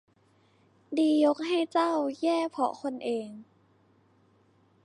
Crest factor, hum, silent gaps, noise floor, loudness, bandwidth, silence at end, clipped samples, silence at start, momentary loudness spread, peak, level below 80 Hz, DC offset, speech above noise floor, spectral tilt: 16 dB; none; none; -65 dBFS; -28 LUFS; 11 kHz; 1.4 s; under 0.1%; 0.9 s; 11 LU; -14 dBFS; -82 dBFS; under 0.1%; 38 dB; -4.5 dB/octave